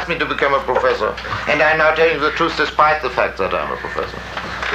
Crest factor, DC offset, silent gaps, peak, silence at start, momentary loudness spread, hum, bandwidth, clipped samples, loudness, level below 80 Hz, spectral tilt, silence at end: 16 dB; under 0.1%; none; -2 dBFS; 0 s; 11 LU; none; 14.5 kHz; under 0.1%; -17 LUFS; -40 dBFS; -4.5 dB/octave; 0 s